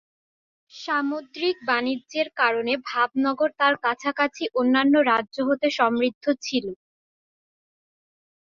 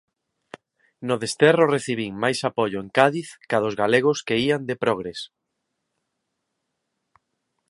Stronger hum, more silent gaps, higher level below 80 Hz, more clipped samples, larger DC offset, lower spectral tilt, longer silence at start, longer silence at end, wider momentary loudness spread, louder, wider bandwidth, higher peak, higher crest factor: neither; first, 6.15-6.21 s vs none; second, -70 dBFS vs -64 dBFS; neither; neither; second, -3.5 dB/octave vs -5 dB/octave; second, 0.75 s vs 1 s; second, 1.7 s vs 2.45 s; second, 8 LU vs 12 LU; about the same, -23 LUFS vs -22 LUFS; second, 7.4 kHz vs 11.5 kHz; second, -6 dBFS vs 0 dBFS; about the same, 20 dB vs 24 dB